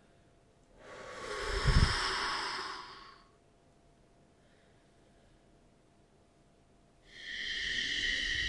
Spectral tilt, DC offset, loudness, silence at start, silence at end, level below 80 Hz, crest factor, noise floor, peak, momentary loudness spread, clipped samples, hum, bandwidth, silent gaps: -3.5 dB/octave; under 0.1%; -34 LUFS; 0.8 s; 0 s; -44 dBFS; 24 dB; -65 dBFS; -14 dBFS; 21 LU; under 0.1%; none; 11.5 kHz; none